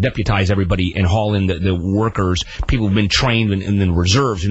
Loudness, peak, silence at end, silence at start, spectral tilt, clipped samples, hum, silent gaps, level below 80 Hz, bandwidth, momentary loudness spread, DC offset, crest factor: -17 LUFS; -2 dBFS; 0 s; 0 s; -5.5 dB/octave; under 0.1%; none; none; -28 dBFS; 8.2 kHz; 4 LU; under 0.1%; 14 dB